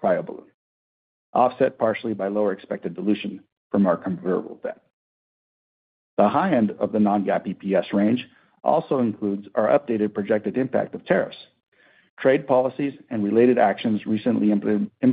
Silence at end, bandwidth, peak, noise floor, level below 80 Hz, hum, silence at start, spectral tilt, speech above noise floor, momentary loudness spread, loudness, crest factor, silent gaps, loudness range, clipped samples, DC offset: 0 s; 4.8 kHz; -4 dBFS; under -90 dBFS; -68 dBFS; none; 0 s; -11.5 dB/octave; over 68 dB; 9 LU; -23 LUFS; 18 dB; 0.54-1.33 s, 3.52-3.70 s, 4.93-6.17 s, 11.68-11.72 s, 12.10-12.17 s; 4 LU; under 0.1%; under 0.1%